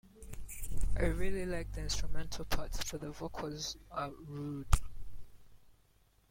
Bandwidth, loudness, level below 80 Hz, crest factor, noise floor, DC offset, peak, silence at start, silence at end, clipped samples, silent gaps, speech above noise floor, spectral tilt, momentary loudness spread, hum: 16.5 kHz; -40 LUFS; -40 dBFS; 22 dB; -68 dBFS; under 0.1%; -12 dBFS; 0.2 s; 0.75 s; under 0.1%; none; 35 dB; -4.5 dB/octave; 12 LU; none